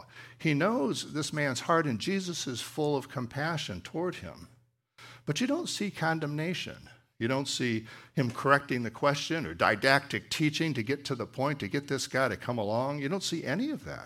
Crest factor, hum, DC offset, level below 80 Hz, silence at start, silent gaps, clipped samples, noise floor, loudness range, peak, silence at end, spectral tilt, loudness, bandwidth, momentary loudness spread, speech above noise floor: 24 dB; none; under 0.1%; -66 dBFS; 0 s; none; under 0.1%; -61 dBFS; 6 LU; -8 dBFS; 0 s; -4.5 dB/octave; -31 LUFS; 16 kHz; 9 LU; 30 dB